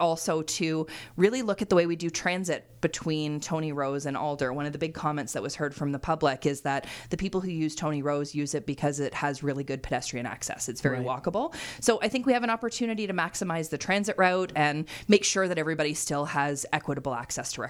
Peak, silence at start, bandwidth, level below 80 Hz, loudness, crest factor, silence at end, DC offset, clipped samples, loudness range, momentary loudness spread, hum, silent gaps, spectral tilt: -6 dBFS; 0 s; 17 kHz; -54 dBFS; -28 LUFS; 22 dB; 0 s; under 0.1%; under 0.1%; 4 LU; 8 LU; none; none; -4.5 dB/octave